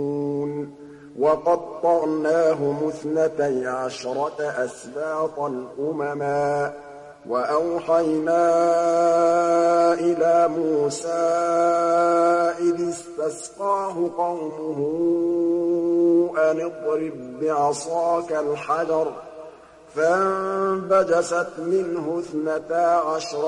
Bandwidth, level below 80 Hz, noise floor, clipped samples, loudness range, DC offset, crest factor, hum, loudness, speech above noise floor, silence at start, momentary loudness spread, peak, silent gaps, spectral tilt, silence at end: 11 kHz; -64 dBFS; -45 dBFS; under 0.1%; 6 LU; under 0.1%; 14 dB; none; -22 LUFS; 24 dB; 0 s; 10 LU; -8 dBFS; none; -5.5 dB/octave; 0 s